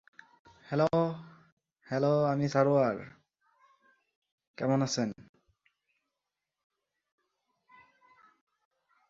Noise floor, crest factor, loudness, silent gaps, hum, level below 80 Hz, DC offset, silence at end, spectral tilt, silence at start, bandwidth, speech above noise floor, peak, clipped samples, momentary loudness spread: -88 dBFS; 22 dB; -30 LUFS; 1.52-1.57 s, 4.16-4.22 s, 4.32-4.38 s, 4.47-4.54 s; none; -70 dBFS; under 0.1%; 3.85 s; -6.5 dB/octave; 0.7 s; 7.8 kHz; 60 dB; -12 dBFS; under 0.1%; 14 LU